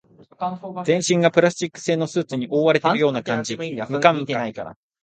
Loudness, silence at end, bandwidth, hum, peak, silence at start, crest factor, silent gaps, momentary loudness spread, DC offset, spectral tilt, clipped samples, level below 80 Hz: -21 LUFS; 0.3 s; 9.4 kHz; none; 0 dBFS; 0.4 s; 20 dB; none; 12 LU; under 0.1%; -5 dB/octave; under 0.1%; -64 dBFS